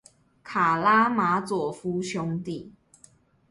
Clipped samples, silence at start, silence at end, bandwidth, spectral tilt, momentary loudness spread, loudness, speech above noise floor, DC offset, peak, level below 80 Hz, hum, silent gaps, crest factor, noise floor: under 0.1%; 0.45 s; 0.8 s; 11.5 kHz; -5.5 dB/octave; 13 LU; -25 LUFS; 33 dB; under 0.1%; -8 dBFS; -64 dBFS; none; none; 18 dB; -58 dBFS